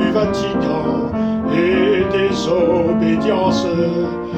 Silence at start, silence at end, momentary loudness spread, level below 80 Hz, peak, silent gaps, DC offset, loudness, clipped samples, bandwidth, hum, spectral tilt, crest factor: 0 s; 0 s; 4 LU; -40 dBFS; -4 dBFS; none; under 0.1%; -17 LUFS; under 0.1%; 8.4 kHz; none; -6.5 dB/octave; 12 dB